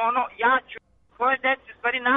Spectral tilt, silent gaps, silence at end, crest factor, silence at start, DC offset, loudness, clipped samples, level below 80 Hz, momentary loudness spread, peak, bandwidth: -5.5 dB/octave; none; 0 s; 14 dB; 0 s; under 0.1%; -23 LUFS; under 0.1%; -62 dBFS; 11 LU; -10 dBFS; 4 kHz